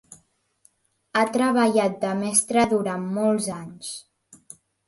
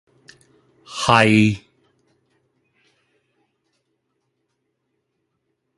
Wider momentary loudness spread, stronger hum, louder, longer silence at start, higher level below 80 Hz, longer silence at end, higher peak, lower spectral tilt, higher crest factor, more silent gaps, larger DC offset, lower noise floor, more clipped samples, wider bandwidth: second, 15 LU vs 19 LU; neither; second, -22 LUFS vs -16 LUFS; second, 0.1 s vs 0.9 s; second, -64 dBFS vs -54 dBFS; second, 0.85 s vs 4.2 s; second, -6 dBFS vs 0 dBFS; about the same, -4 dB/octave vs -5 dB/octave; about the same, 20 dB vs 24 dB; neither; neither; second, -63 dBFS vs -74 dBFS; neither; about the same, 12 kHz vs 11.5 kHz